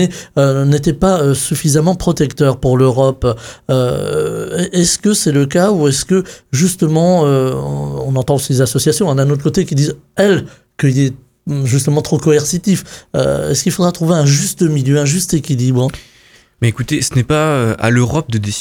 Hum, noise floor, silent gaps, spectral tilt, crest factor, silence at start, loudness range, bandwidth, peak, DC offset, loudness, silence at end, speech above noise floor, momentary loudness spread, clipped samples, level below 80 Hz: none; -47 dBFS; none; -5.5 dB/octave; 14 dB; 0 s; 2 LU; 18 kHz; 0 dBFS; under 0.1%; -14 LUFS; 0 s; 34 dB; 6 LU; under 0.1%; -38 dBFS